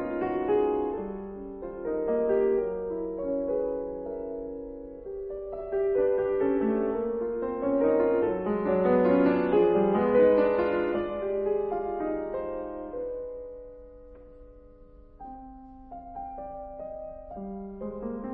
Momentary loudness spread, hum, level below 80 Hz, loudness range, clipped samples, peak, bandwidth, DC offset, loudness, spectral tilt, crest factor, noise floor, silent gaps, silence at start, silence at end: 18 LU; none; -52 dBFS; 18 LU; under 0.1%; -12 dBFS; 4.9 kHz; under 0.1%; -27 LUFS; -11 dB/octave; 18 dB; -51 dBFS; none; 0 s; 0 s